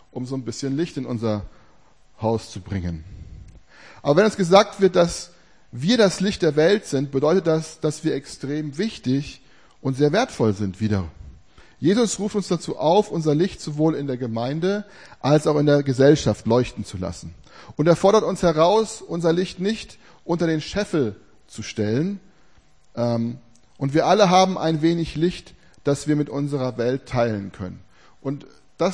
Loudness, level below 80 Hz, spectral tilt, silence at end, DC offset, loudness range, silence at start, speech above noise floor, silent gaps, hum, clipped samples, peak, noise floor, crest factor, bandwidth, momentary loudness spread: -21 LUFS; -48 dBFS; -6 dB/octave; 0 s; 0.2%; 6 LU; 0.15 s; 36 dB; none; none; under 0.1%; 0 dBFS; -57 dBFS; 22 dB; 10.5 kHz; 15 LU